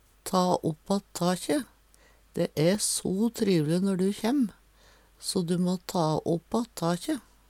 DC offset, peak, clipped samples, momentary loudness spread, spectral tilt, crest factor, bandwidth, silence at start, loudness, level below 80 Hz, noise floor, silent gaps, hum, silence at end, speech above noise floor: under 0.1%; -10 dBFS; under 0.1%; 6 LU; -5.5 dB/octave; 20 dB; 16.5 kHz; 0.25 s; -28 LUFS; -60 dBFS; -59 dBFS; none; none; 0.3 s; 32 dB